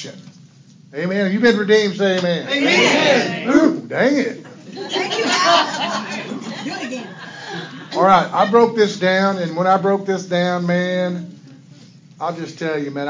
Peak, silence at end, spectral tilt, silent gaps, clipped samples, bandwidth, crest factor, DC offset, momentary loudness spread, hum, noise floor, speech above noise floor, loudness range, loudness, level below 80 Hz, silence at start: -2 dBFS; 0 s; -4.5 dB/octave; none; under 0.1%; 7.6 kHz; 16 dB; under 0.1%; 16 LU; none; -46 dBFS; 28 dB; 5 LU; -17 LUFS; -64 dBFS; 0 s